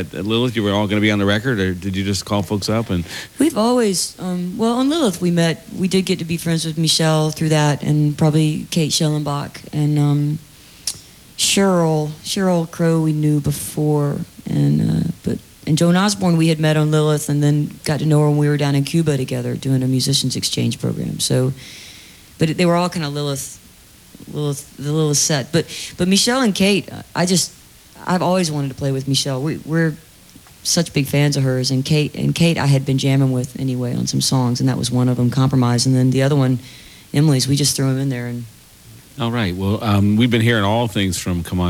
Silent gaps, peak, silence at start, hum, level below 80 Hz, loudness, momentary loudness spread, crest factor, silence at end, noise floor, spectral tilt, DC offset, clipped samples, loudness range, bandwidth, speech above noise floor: none; -2 dBFS; 0 s; none; -48 dBFS; -18 LUFS; 9 LU; 16 dB; 0 s; -45 dBFS; -5 dB/octave; under 0.1%; under 0.1%; 3 LU; 17.5 kHz; 28 dB